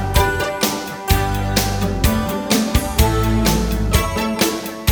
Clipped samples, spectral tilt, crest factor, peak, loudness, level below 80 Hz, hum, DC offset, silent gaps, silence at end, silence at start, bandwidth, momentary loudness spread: under 0.1%; -4.5 dB/octave; 16 dB; -2 dBFS; -18 LUFS; -24 dBFS; none; under 0.1%; none; 0 s; 0 s; over 20 kHz; 4 LU